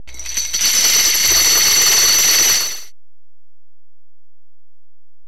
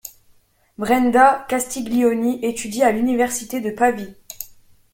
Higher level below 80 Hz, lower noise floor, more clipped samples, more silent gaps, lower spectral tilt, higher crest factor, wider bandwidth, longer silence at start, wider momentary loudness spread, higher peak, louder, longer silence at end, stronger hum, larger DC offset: first, -46 dBFS vs -54 dBFS; first, -80 dBFS vs -56 dBFS; neither; neither; second, 2 dB/octave vs -4 dB/octave; about the same, 14 dB vs 18 dB; first, over 20 kHz vs 17 kHz; about the same, 0.1 s vs 0.05 s; second, 12 LU vs 20 LU; about the same, -2 dBFS vs -2 dBFS; first, -10 LUFS vs -19 LUFS; first, 2.4 s vs 0.5 s; neither; first, 5% vs under 0.1%